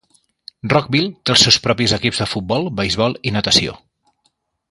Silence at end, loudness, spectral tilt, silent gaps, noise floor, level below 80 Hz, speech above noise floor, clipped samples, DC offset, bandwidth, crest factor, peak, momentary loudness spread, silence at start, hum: 0.95 s; -16 LUFS; -3.5 dB/octave; none; -66 dBFS; -44 dBFS; 49 dB; under 0.1%; under 0.1%; 11.5 kHz; 18 dB; 0 dBFS; 9 LU; 0.65 s; none